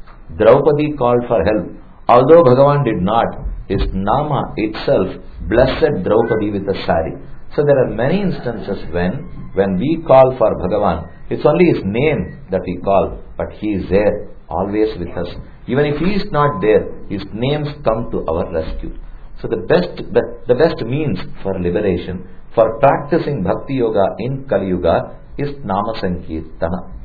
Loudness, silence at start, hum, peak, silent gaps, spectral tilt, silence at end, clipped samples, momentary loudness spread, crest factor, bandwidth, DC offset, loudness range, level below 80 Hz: -16 LUFS; 0.1 s; none; 0 dBFS; none; -10 dB/octave; 0 s; under 0.1%; 14 LU; 16 dB; 4.9 kHz; under 0.1%; 5 LU; -32 dBFS